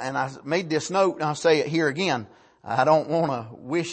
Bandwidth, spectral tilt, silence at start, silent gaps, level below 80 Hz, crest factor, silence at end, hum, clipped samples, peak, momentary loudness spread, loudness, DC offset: 8.8 kHz; -5 dB/octave; 0 s; none; -68 dBFS; 18 dB; 0 s; none; under 0.1%; -6 dBFS; 8 LU; -24 LUFS; under 0.1%